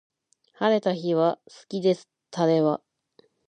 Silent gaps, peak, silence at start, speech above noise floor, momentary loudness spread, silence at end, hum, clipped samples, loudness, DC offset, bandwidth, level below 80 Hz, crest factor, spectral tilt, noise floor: none; -8 dBFS; 0.6 s; 39 dB; 12 LU; 0.7 s; none; under 0.1%; -25 LUFS; under 0.1%; 9.6 kHz; -78 dBFS; 18 dB; -7 dB/octave; -62 dBFS